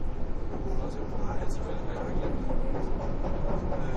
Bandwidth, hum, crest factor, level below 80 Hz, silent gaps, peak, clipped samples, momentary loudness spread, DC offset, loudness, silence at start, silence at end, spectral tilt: 7.4 kHz; none; 12 dB; -30 dBFS; none; -16 dBFS; under 0.1%; 4 LU; under 0.1%; -34 LUFS; 0 s; 0 s; -8 dB/octave